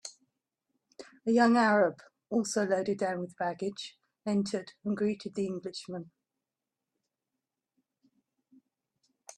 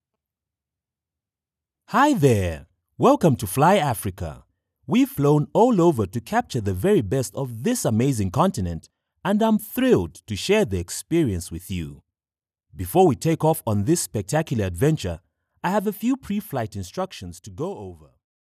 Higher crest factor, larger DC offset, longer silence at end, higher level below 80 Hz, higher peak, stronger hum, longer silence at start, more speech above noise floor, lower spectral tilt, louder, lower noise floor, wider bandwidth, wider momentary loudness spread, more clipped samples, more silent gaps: about the same, 20 dB vs 18 dB; neither; first, 3.35 s vs 0.6 s; second, -78 dBFS vs -52 dBFS; second, -14 dBFS vs -4 dBFS; neither; second, 0.05 s vs 1.9 s; second, 60 dB vs over 69 dB; about the same, -5 dB/octave vs -6 dB/octave; second, -30 LUFS vs -22 LUFS; about the same, -89 dBFS vs under -90 dBFS; second, 12 kHz vs 15.5 kHz; first, 17 LU vs 13 LU; neither; neither